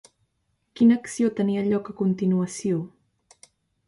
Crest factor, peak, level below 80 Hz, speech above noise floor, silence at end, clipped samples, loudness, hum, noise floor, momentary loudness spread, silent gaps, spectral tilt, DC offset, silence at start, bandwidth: 16 dB; -8 dBFS; -66 dBFS; 51 dB; 1 s; under 0.1%; -24 LUFS; none; -73 dBFS; 8 LU; none; -7 dB/octave; under 0.1%; 0.75 s; 11.5 kHz